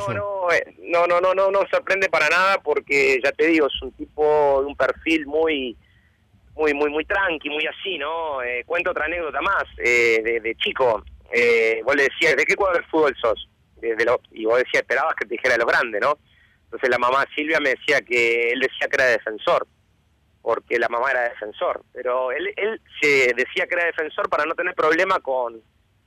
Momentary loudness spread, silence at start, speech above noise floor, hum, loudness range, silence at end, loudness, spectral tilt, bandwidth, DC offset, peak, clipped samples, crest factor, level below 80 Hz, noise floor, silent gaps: 9 LU; 0 s; 41 dB; none; 4 LU; 0.45 s; -20 LUFS; -3.5 dB/octave; 15 kHz; under 0.1%; -10 dBFS; under 0.1%; 10 dB; -54 dBFS; -62 dBFS; none